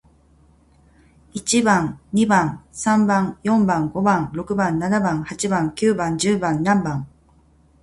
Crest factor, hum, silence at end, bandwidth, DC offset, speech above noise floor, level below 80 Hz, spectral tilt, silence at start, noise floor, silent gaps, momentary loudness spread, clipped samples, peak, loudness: 18 dB; none; 0.75 s; 11.5 kHz; under 0.1%; 35 dB; -50 dBFS; -5 dB/octave; 1.35 s; -55 dBFS; none; 8 LU; under 0.1%; -2 dBFS; -20 LUFS